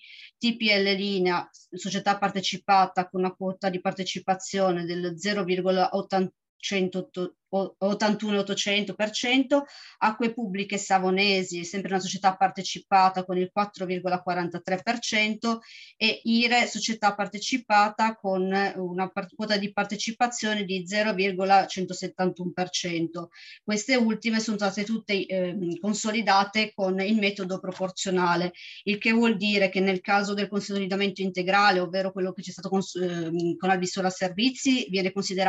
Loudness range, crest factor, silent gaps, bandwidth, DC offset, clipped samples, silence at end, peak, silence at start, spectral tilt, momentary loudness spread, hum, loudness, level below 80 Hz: 3 LU; 18 dB; 6.49-6.59 s; 8.6 kHz; under 0.1%; under 0.1%; 0 s; -8 dBFS; 0.05 s; -4 dB/octave; 9 LU; none; -26 LUFS; -74 dBFS